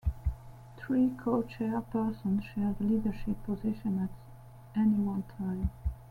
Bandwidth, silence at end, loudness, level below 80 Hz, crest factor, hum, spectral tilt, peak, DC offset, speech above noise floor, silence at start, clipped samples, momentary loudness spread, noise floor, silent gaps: 11 kHz; 0 s; -33 LUFS; -44 dBFS; 16 dB; none; -9.5 dB/octave; -16 dBFS; under 0.1%; 20 dB; 0.05 s; under 0.1%; 14 LU; -50 dBFS; none